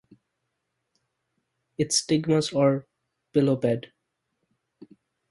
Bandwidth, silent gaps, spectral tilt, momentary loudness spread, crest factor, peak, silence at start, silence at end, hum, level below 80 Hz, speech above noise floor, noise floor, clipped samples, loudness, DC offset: 11.5 kHz; none; -5 dB/octave; 9 LU; 20 dB; -10 dBFS; 1.8 s; 1.5 s; none; -66 dBFS; 57 dB; -80 dBFS; under 0.1%; -24 LUFS; under 0.1%